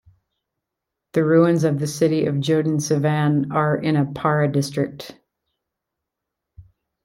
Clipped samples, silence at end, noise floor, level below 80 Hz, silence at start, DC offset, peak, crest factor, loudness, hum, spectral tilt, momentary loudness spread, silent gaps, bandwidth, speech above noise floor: under 0.1%; 0.4 s; -83 dBFS; -60 dBFS; 1.15 s; under 0.1%; -4 dBFS; 18 dB; -20 LUFS; none; -6.5 dB/octave; 9 LU; none; 14 kHz; 63 dB